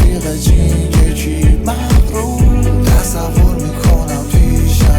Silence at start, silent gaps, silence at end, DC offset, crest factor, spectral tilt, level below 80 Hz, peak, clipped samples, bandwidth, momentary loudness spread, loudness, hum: 0 s; none; 0 s; under 0.1%; 8 dB; -6 dB/octave; -12 dBFS; -2 dBFS; under 0.1%; 18 kHz; 3 LU; -13 LUFS; none